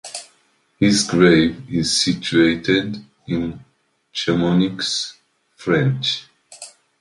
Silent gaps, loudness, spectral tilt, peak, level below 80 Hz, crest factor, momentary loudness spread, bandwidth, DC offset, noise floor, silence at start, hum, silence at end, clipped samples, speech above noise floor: none; -18 LUFS; -4.5 dB/octave; 0 dBFS; -48 dBFS; 18 dB; 19 LU; 11.5 kHz; under 0.1%; -61 dBFS; 0.05 s; none; 0.35 s; under 0.1%; 44 dB